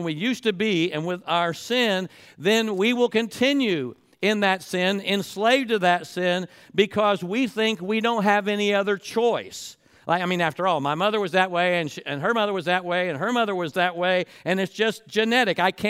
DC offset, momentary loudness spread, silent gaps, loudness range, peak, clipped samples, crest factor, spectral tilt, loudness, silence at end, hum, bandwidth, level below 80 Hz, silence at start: under 0.1%; 6 LU; none; 1 LU; -6 dBFS; under 0.1%; 18 dB; -4.5 dB/octave; -23 LUFS; 0 s; none; 16 kHz; -70 dBFS; 0 s